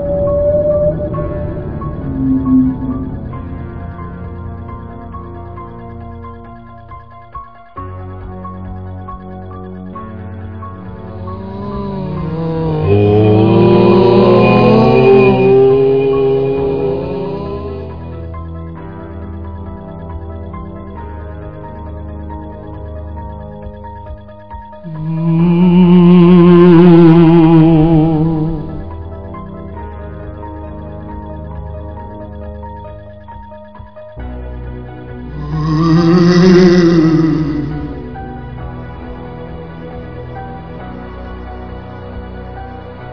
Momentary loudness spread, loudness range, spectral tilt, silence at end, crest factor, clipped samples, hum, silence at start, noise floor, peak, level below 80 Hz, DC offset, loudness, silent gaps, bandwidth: 22 LU; 21 LU; -9 dB/octave; 0 s; 14 dB; 0.4%; none; 0 s; -34 dBFS; 0 dBFS; -32 dBFS; 0.9%; -10 LUFS; none; 5.4 kHz